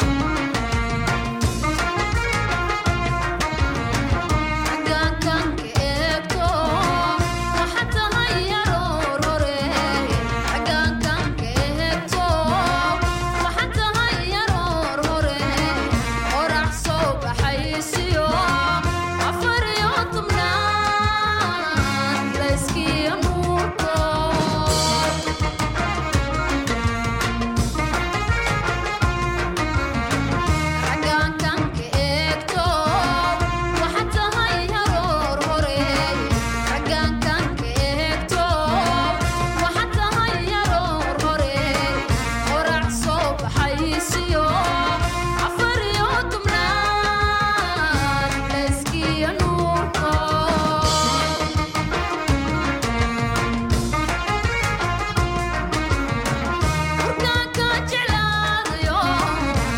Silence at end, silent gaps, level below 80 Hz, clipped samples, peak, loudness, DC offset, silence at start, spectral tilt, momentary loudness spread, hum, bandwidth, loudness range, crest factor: 0 s; none; -30 dBFS; under 0.1%; -6 dBFS; -21 LUFS; under 0.1%; 0 s; -4.5 dB/octave; 3 LU; none; 16.5 kHz; 2 LU; 16 dB